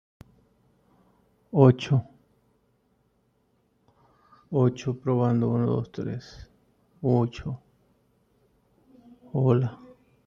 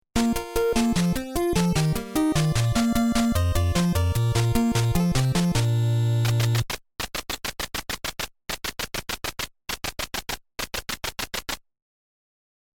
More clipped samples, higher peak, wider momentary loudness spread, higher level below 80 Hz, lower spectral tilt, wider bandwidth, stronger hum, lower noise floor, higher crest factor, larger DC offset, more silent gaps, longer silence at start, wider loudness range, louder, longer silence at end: neither; first, -4 dBFS vs -8 dBFS; first, 16 LU vs 9 LU; second, -60 dBFS vs -38 dBFS; first, -9 dB/octave vs -5 dB/octave; second, 7 kHz vs 18.5 kHz; neither; second, -69 dBFS vs under -90 dBFS; first, 24 dB vs 16 dB; neither; neither; first, 1.55 s vs 0.15 s; second, 5 LU vs 8 LU; about the same, -25 LUFS vs -25 LUFS; second, 0.5 s vs 1.15 s